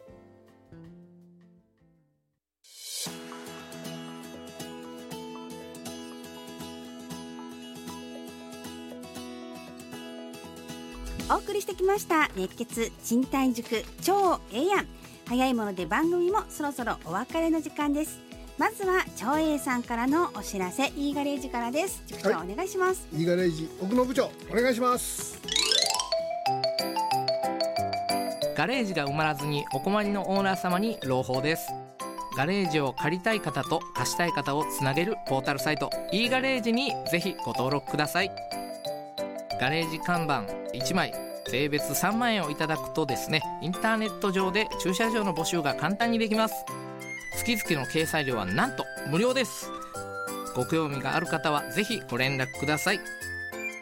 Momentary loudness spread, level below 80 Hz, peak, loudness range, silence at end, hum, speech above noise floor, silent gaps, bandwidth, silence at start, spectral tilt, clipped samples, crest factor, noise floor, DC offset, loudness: 15 LU; -54 dBFS; -8 dBFS; 14 LU; 0 s; none; 51 dB; none; 16.5 kHz; 0 s; -4 dB/octave; under 0.1%; 22 dB; -78 dBFS; under 0.1%; -28 LUFS